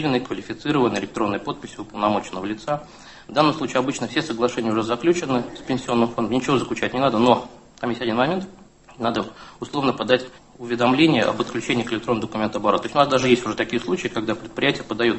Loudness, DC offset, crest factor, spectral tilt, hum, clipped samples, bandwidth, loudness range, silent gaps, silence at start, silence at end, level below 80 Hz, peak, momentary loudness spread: -22 LUFS; under 0.1%; 22 dB; -5 dB/octave; none; under 0.1%; 8.6 kHz; 4 LU; none; 0 s; 0 s; -54 dBFS; 0 dBFS; 11 LU